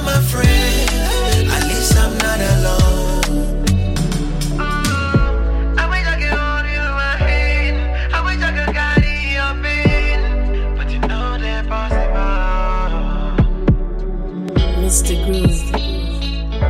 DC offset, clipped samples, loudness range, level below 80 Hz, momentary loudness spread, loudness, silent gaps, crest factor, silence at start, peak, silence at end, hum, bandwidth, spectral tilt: under 0.1%; under 0.1%; 4 LU; -18 dBFS; 7 LU; -17 LUFS; none; 16 dB; 0 s; 0 dBFS; 0 s; none; 16.5 kHz; -4.5 dB/octave